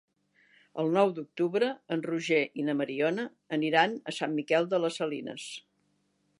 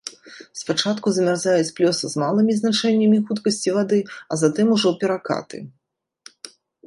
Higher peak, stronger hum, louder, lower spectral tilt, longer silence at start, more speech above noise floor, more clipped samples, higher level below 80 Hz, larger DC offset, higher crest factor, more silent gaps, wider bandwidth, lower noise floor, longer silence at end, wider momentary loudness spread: second, -8 dBFS vs -4 dBFS; neither; second, -29 LUFS vs -20 LUFS; about the same, -5 dB/octave vs -5 dB/octave; first, 0.75 s vs 0.05 s; second, 44 dB vs 56 dB; neither; second, -86 dBFS vs -68 dBFS; neither; first, 22 dB vs 16 dB; neither; about the same, 11.5 kHz vs 11.5 kHz; about the same, -73 dBFS vs -76 dBFS; first, 0.8 s vs 0.4 s; second, 11 LU vs 19 LU